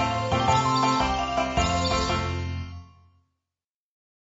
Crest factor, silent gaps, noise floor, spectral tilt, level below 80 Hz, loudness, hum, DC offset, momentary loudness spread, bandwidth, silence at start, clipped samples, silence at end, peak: 16 dB; none; under -90 dBFS; -4 dB/octave; -40 dBFS; -24 LUFS; none; under 0.1%; 12 LU; 8 kHz; 0 s; under 0.1%; 1.4 s; -10 dBFS